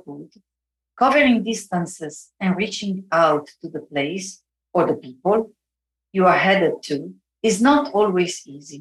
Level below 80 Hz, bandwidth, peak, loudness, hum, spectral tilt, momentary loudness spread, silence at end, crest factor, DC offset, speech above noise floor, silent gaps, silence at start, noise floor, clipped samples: -60 dBFS; 12.5 kHz; -4 dBFS; -20 LUFS; none; -5 dB/octave; 18 LU; 0 s; 16 dB; under 0.1%; 65 dB; none; 0.05 s; -85 dBFS; under 0.1%